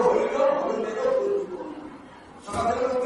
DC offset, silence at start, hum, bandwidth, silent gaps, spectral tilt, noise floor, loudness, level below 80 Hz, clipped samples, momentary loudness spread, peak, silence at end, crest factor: under 0.1%; 0 s; none; 11.5 kHz; none; -5.5 dB/octave; -45 dBFS; -25 LUFS; -56 dBFS; under 0.1%; 20 LU; -8 dBFS; 0 s; 16 dB